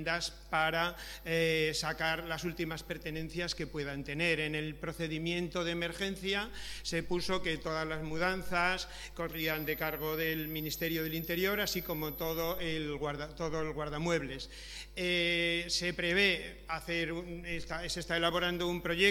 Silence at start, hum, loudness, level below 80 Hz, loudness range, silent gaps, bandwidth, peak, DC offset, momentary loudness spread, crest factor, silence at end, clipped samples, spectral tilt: 0 s; none; -34 LUFS; -52 dBFS; 3 LU; none; 19 kHz; -12 dBFS; under 0.1%; 9 LU; 22 dB; 0 s; under 0.1%; -4 dB/octave